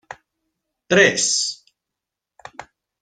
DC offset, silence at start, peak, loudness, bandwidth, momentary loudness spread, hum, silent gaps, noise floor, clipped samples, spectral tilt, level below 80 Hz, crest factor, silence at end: under 0.1%; 0.1 s; 0 dBFS; -17 LUFS; 10 kHz; 25 LU; none; none; -84 dBFS; under 0.1%; -2 dB/octave; -62 dBFS; 22 dB; 0.4 s